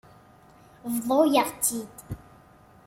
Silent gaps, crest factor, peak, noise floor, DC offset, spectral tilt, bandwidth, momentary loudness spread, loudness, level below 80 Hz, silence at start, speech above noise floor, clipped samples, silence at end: none; 20 dB; -8 dBFS; -54 dBFS; under 0.1%; -3.5 dB/octave; 16.5 kHz; 20 LU; -24 LUFS; -58 dBFS; 0.85 s; 29 dB; under 0.1%; 0.7 s